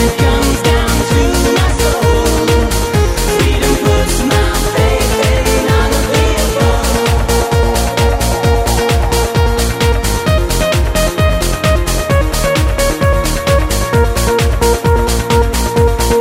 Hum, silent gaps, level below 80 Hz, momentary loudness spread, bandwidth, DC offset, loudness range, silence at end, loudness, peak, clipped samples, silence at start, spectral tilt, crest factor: none; none; -16 dBFS; 2 LU; 16.5 kHz; under 0.1%; 1 LU; 0 s; -12 LUFS; 0 dBFS; under 0.1%; 0 s; -4.5 dB/octave; 12 dB